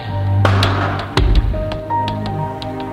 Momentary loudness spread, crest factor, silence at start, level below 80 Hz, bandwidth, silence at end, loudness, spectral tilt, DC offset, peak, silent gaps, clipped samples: 9 LU; 16 dB; 0 s; -22 dBFS; 11 kHz; 0 s; -18 LUFS; -6.5 dB/octave; under 0.1%; -2 dBFS; none; under 0.1%